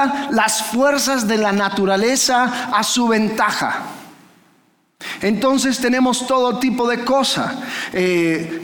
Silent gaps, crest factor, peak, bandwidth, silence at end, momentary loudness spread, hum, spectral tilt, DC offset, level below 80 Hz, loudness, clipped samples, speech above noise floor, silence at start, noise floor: none; 14 dB; -4 dBFS; 19.5 kHz; 0 s; 7 LU; none; -3 dB/octave; under 0.1%; -58 dBFS; -17 LUFS; under 0.1%; 41 dB; 0 s; -58 dBFS